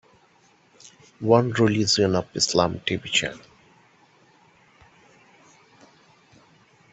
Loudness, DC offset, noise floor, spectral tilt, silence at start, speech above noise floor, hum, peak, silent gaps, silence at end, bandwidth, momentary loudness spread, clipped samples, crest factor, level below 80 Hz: -22 LUFS; under 0.1%; -59 dBFS; -4 dB/octave; 0.85 s; 37 dB; none; -4 dBFS; none; 3.55 s; 8.4 kHz; 11 LU; under 0.1%; 22 dB; -60 dBFS